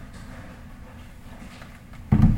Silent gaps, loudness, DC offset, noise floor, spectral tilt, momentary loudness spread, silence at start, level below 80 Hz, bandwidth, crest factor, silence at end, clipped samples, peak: none; -24 LUFS; under 0.1%; -42 dBFS; -9 dB/octave; 20 LU; 0 s; -32 dBFS; 15.5 kHz; 20 dB; 0 s; under 0.1%; -6 dBFS